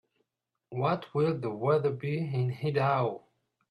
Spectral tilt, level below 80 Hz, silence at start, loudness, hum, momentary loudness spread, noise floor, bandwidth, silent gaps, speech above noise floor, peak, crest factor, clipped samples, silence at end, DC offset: -9 dB/octave; -70 dBFS; 0.7 s; -30 LUFS; none; 6 LU; -85 dBFS; 9.4 kHz; none; 56 dB; -14 dBFS; 16 dB; under 0.1%; 0.5 s; under 0.1%